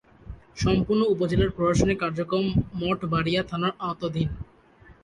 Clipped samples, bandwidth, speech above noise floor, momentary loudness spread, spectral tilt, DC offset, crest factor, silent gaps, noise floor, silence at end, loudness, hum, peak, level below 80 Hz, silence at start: under 0.1%; 11 kHz; 29 dB; 8 LU; -6.5 dB/octave; under 0.1%; 18 dB; none; -53 dBFS; 0.1 s; -25 LUFS; none; -8 dBFS; -40 dBFS; 0.25 s